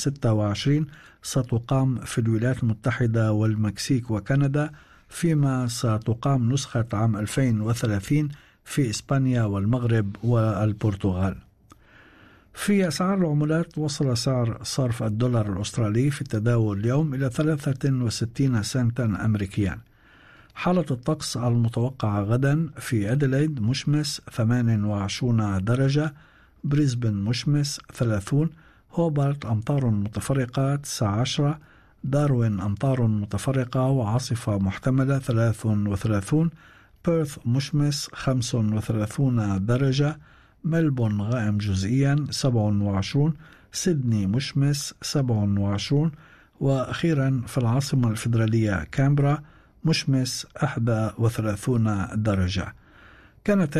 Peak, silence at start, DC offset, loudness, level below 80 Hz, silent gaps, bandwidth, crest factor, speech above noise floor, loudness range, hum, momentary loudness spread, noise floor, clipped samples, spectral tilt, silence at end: -12 dBFS; 0 s; under 0.1%; -24 LUFS; -50 dBFS; none; 13.5 kHz; 12 dB; 31 dB; 2 LU; none; 5 LU; -54 dBFS; under 0.1%; -6.5 dB/octave; 0 s